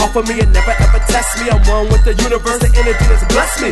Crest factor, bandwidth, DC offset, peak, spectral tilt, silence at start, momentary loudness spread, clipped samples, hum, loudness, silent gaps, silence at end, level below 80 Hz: 10 dB; 12.5 kHz; under 0.1%; 0 dBFS; -4.5 dB/octave; 0 s; 2 LU; under 0.1%; none; -13 LUFS; none; 0 s; -12 dBFS